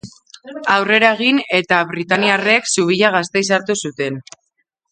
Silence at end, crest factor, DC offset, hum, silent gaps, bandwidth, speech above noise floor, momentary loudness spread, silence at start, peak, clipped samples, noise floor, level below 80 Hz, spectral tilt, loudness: 0.7 s; 18 dB; under 0.1%; none; none; 9.6 kHz; 53 dB; 11 LU; 0.05 s; 0 dBFS; under 0.1%; -69 dBFS; -62 dBFS; -3 dB/octave; -15 LUFS